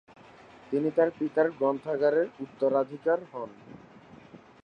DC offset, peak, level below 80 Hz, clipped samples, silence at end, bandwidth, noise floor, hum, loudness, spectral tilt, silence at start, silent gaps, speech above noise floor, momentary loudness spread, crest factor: under 0.1%; -10 dBFS; -74 dBFS; under 0.1%; 0.25 s; 6.4 kHz; -52 dBFS; none; -28 LUFS; -8.5 dB/octave; 0.7 s; none; 25 dB; 8 LU; 18 dB